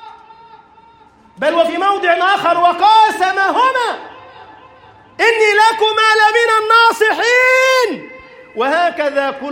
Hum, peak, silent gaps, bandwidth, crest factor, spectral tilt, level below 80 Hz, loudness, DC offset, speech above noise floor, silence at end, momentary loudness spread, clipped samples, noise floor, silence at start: none; 0 dBFS; none; 16.5 kHz; 14 dB; -1.5 dB/octave; -62 dBFS; -12 LUFS; under 0.1%; 33 dB; 0 s; 9 LU; under 0.1%; -46 dBFS; 0 s